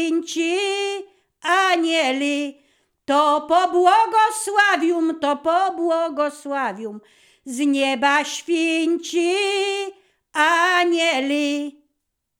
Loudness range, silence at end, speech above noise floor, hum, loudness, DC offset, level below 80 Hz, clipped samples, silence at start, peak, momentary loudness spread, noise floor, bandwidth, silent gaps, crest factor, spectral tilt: 4 LU; 0.7 s; 56 dB; none; -19 LUFS; under 0.1%; -74 dBFS; under 0.1%; 0 s; -4 dBFS; 11 LU; -76 dBFS; 16.5 kHz; none; 18 dB; -1.5 dB/octave